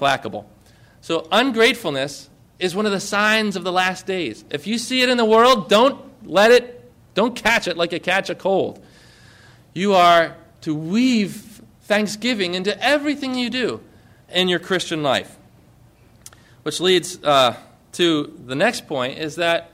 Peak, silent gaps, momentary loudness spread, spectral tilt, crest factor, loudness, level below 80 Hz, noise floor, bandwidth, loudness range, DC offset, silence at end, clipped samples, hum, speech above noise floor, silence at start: -4 dBFS; none; 14 LU; -4 dB/octave; 16 dB; -19 LUFS; -56 dBFS; -51 dBFS; 16 kHz; 5 LU; under 0.1%; 0.1 s; under 0.1%; none; 32 dB; 0 s